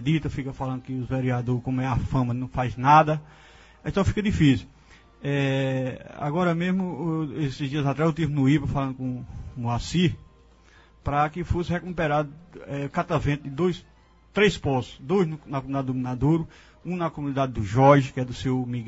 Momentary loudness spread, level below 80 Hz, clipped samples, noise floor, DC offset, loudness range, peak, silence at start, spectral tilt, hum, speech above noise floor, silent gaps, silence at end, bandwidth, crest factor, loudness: 12 LU; -44 dBFS; under 0.1%; -54 dBFS; under 0.1%; 4 LU; -4 dBFS; 0 s; -7 dB/octave; none; 30 dB; none; 0 s; 8 kHz; 22 dB; -25 LUFS